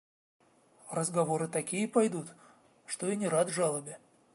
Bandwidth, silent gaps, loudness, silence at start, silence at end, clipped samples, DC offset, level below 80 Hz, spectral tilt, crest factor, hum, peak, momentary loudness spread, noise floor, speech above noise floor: 12 kHz; none; -32 LUFS; 0.85 s; 0.4 s; under 0.1%; under 0.1%; -82 dBFS; -5 dB/octave; 20 dB; none; -14 dBFS; 13 LU; -58 dBFS; 27 dB